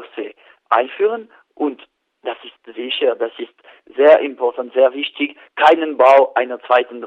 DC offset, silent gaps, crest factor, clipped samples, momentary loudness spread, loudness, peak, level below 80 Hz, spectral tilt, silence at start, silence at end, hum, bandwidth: under 0.1%; none; 18 dB; under 0.1%; 19 LU; -16 LUFS; 0 dBFS; -72 dBFS; -3.5 dB/octave; 0 s; 0 s; none; 7.6 kHz